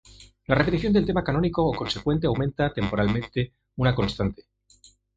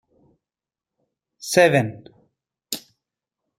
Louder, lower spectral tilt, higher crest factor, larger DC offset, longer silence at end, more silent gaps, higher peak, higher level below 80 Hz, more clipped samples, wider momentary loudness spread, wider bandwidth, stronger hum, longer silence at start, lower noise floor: second, -25 LUFS vs -20 LUFS; first, -7.5 dB/octave vs -4.5 dB/octave; about the same, 20 dB vs 24 dB; neither; about the same, 0.85 s vs 0.8 s; neither; about the same, -4 dBFS vs -2 dBFS; first, -42 dBFS vs -66 dBFS; neither; second, 8 LU vs 16 LU; second, 7.8 kHz vs 16 kHz; neither; second, 0.2 s vs 1.45 s; second, -57 dBFS vs -90 dBFS